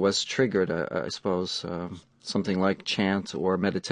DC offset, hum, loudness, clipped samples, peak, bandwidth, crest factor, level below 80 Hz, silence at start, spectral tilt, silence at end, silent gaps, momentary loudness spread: under 0.1%; none; -27 LUFS; under 0.1%; -10 dBFS; 10.5 kHz; 18 dB; -56 dBFS; 0 s; -4.5 dB/octave; 0 s; none; 8 LU